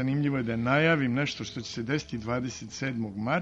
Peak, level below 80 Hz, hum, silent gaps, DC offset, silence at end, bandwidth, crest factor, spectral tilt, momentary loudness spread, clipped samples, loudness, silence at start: -12 dBFS; -56 dBFS; none; none; under 0.1%; 0 s; 8 kHz; 16 dB; -6 dB/octave; 11 LU; under 0.1%; -29 LUFS; 0 s